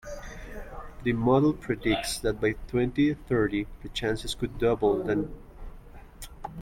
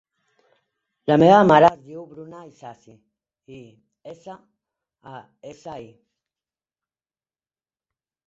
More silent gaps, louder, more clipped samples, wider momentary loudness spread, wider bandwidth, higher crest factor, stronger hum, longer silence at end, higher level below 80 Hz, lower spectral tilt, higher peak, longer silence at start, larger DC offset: neither; second, -27 LUFS vs -15 LUFS; neither; second, 19 LU vs 29 LU; first, 16.5 kHz vs 7.6 kHz; about the same, 18 dB vs 22 dB; neither; second, 0 s vs 2.45 s; first, -44 dBFS vs -62 dBFS; second, -5.5 dB/octave vs -7 dB/octave; second, -10 dBFS vs -2 dBFS; second, 0.05 s vs 1.1 s; neither